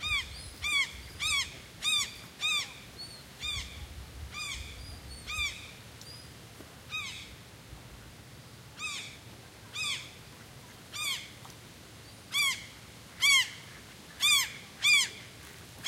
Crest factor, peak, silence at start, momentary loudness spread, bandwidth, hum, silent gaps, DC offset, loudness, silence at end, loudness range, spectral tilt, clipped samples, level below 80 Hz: 22 dB; -12 dBFS; 0 s; 25 LU; 16 kHz; none; none; under 0.1%; -30 LUFS; 0 s; 14 LU; 0 dB/octave; under 0.1%; -54 dBFS